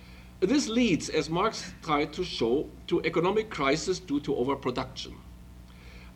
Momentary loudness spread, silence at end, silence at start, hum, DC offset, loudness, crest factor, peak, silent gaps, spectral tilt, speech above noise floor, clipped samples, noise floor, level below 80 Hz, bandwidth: 12 LU; 0 s; 0 s; 60 Hz at -50 dBFS; under 0.1%; -28 LUFS; 18 dB; -12 dBFS; none; -4.5 dB/octave; 20 dB; under 0.1%; -48 dBFS; -50 dBFS; 15.5 kHz